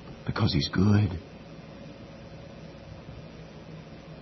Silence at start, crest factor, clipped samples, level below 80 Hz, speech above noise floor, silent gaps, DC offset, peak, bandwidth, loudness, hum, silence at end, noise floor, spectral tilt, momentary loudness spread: 0 s; 20 dB; under 0.1%; -52 dBFS; 20 dB; none; under 0.1%; -10 dBFS; 6.2 kHz; -26 LUFS; none; 0 s; -45 dBFS; -7 dB/octave; 22 LU